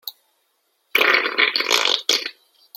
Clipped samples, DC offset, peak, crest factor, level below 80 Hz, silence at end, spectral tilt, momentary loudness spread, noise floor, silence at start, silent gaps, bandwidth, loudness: under 0.1%; under 0.1%; 0 dBFS; 22 dB; -74 dBFS; 0.45 s; 1.5 dB/octave; 9 LU; -68 dBFS; 0.05 s; none; 16.5 kHz; -17 LUFS